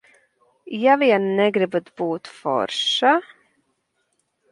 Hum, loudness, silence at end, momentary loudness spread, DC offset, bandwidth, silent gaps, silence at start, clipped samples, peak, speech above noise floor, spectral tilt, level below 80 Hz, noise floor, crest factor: none; -20 LUFS; 1.3 s; 10 LU; under 0.1%; 11 kHz; none; 0.65 s; under 0.1%; -4 dBFS; 51 dB; -4.5 dB/octave; -74 dBFS; -71 dBFS; 18 dB